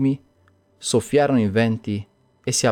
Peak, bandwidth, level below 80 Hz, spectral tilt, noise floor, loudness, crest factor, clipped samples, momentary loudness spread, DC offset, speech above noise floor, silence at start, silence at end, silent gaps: -6 dBFS; 18.5 kHz; -60 dBFS; -5 dB/octave; -59 dBFS; -22 LUFS; 16 dB; under 0.1%; 12 LU; under 0.1%; 39 dB; 0 s; 0 s; none